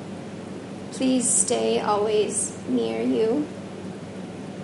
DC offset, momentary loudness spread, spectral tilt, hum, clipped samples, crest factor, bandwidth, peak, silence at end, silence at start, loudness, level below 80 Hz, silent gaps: under 0.1%; 17 LU; -3.5 dB/octave; none; under 0.1%; 20 dB; 11.5 kHz; -6 dBFS; 0 s; 0 s; -23 LUFS; -62 dBFS; none